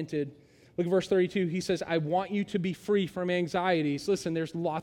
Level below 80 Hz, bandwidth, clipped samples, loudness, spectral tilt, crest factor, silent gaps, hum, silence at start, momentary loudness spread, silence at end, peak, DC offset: -66 dBFS; 14.5 kHz; under 0.1%; -30 LUFS; -6 dB/octave; 16 dB; none; none; 0 s; 7 LU; 0 s; -14 dBFS; under 0.1%